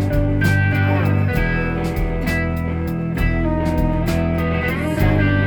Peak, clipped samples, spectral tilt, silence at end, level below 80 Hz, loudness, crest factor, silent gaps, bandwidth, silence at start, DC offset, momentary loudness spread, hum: -4 dBFS; under 0.1%; -7.5 dB/octave; 0 s; -26 dBFS; -19 LUFS; 14 dB; none; 20 kHz; 0 s; under 0.1%; 5 LU; none